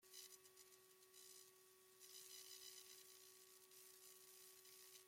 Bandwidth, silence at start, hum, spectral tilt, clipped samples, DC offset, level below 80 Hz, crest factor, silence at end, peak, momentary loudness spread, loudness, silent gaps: 16.5 kHz; 0 s; none; 0.5 dB/octave; under 0.1%; under 0.1%; under -90 dBFS; 22 dB; 0 s; -44 dBFS; 9 LU; -62 LUFS; none